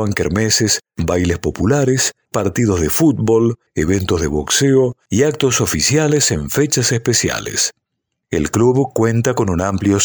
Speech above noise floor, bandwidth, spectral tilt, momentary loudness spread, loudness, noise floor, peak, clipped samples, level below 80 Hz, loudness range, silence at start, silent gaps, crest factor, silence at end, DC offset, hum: 60 dB; over 20 kHz; -4.5 dB/octave; 5 LU; -16 LUFS; -76 dBFS; -2 dBFS; under 0.1%; -36 dBFS; 2 LU; 0 s; none; 14 dB; 0 s; under 0.1%; none